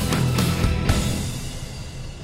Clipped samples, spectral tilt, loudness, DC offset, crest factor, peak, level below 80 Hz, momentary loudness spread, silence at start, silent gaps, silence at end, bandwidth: under 0.1%; -5 dB/octave; -23 LUFS; under 0.1%; 18 dB; -6 dBFS; -30 dBFS; 13 LU; 0 s; none; 0 s; 16 kHz